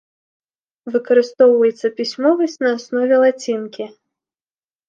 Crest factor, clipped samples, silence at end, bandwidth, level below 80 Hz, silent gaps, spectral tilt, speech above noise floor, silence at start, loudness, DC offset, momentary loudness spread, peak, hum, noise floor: 16 dB; under 0.1%; 1 s; 7.4 kHz; -76 dBFS; none; -4.5 dB/octave; over 74 dB; 0.85 s; -16 LUFS; under 0.1%; 15 LU; -2 dBFS; none; under -90 dBFS